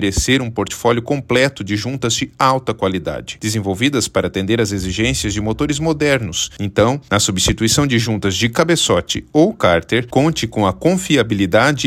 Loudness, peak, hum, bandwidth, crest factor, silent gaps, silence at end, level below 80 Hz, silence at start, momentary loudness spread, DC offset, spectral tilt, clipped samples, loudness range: -16 LUFS; 0 dBFS; none; 16.5 kHz; 16 dB; none; 0 s; -36 dBFS; 0 s; 6 LU; under 0.1%; -4 dB/octave; under 0.1%; 3 LU